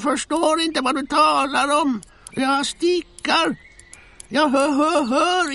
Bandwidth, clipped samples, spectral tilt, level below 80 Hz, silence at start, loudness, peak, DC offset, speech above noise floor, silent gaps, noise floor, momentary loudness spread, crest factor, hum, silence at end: 11.5 kHz; under 0.1%; -2.5 dB/octave; -54 dBFS; 0 s; -19 LUFS; -4 dBFS; under 0.1%; 27 dB; none; -46 dBFS; 7 LU; 16 dB; none; 0 s